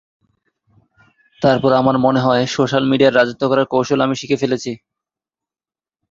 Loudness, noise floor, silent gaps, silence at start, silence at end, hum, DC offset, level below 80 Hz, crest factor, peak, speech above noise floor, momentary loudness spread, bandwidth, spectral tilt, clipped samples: -16 LUFS; under -90 dBFS; none; 1.4 s; 1.35 s; none; under 0.1%; -54 dBFS; 16 dB; -2 dBFS; over 75 dB; 6 LU; 7.6 kHz; -6 dB/octave; under 0.1%